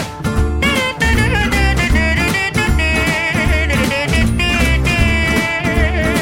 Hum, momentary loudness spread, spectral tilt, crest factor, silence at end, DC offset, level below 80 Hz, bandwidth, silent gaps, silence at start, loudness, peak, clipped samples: none; 2 LU; -5 dB/octave; 12 dB; 0 s; under 0.1%; -20 dBFS; 16.5 kHz; none; 0 s; -14 LUFS; -2 dBFS; under 0.1%